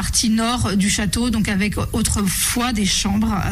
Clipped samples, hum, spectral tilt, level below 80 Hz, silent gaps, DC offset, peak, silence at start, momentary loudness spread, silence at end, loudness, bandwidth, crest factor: under 0.1%; none; -3.5 dB/octave; -30 dBFS; none; under 0.1%; -6 dBFS; 0 s; 2 LU; 0 s; -18 LUFS; 15.5 kHz; 12 dB